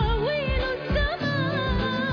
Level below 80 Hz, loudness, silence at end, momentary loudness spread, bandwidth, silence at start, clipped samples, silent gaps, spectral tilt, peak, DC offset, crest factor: -30 dBFS; -26 LUFS; 0 s; 1 LU; 5.4 kHz; 0 s; under 0.1%; none; -7.5 dB/octave; -14 dBFS; under 0.1%; 12 dB